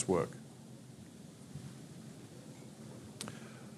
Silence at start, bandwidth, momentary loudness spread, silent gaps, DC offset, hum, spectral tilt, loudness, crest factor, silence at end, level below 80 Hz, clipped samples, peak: 0 s; 15 kHz; 14 LU; none; under 0.1%; none; -5.5 dB/octave; -45 LUFS; 24 dB; 0 s; -72 dBFS; under 0.1%; -18 dBFS